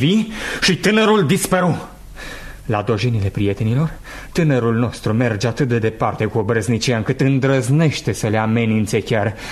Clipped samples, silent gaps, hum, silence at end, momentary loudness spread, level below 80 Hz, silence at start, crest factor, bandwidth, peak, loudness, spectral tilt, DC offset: under 0.1%; none; none; 0 s; 9 LU; -40 dBFS; 0 s; 14 dB; 13.5 kHz; -2 dBFS; -18 LUFS; -5.5 dB/octave; under 0.1%